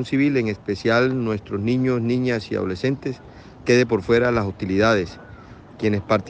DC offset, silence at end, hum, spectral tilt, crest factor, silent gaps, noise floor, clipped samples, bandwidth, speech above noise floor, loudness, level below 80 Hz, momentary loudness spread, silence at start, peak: under 0.1%; 0 s; none; -6.5 dB/octave; 16 dB; none; -42 dBFS; under 0.1%; 8.8 kHz; 21 dB; -21 LUFS; -48 dBFS; 9 LU; 0 s; -6 dBFS